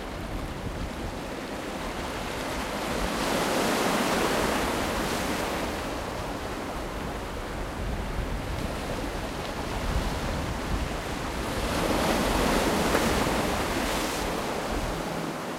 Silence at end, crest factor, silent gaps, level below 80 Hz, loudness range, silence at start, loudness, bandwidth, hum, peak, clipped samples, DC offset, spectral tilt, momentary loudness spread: 0 s; 18 dB; none; -38 dBFS; 7 LU; 0 s; -29 LUFS; 16 kHz; none; -10 dBFS; under 0.1%; under 0.1%; -4 dB/octave; 10 LU